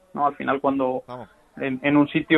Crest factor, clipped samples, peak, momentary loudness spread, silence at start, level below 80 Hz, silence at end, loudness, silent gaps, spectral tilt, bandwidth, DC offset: 18 dB; under 0.1%; -4 dBFS; 13 LU; 0.15 s; -60 dBFS; 0 s; -23 LUFS; none; -8 dB/octave; 4.1 kHz; under 0.1%